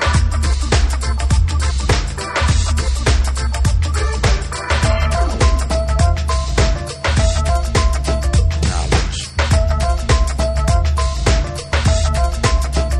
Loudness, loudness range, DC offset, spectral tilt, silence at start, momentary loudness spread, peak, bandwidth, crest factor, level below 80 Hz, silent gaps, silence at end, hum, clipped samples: -17 LUFS; 1 LU; under 0.1%; -4.5 dB/octave; 0 s; 3 LU; 0 dBFS; 12 kHz; 14 dB; -16 dBFS; none; 0 s; none; under 0.1%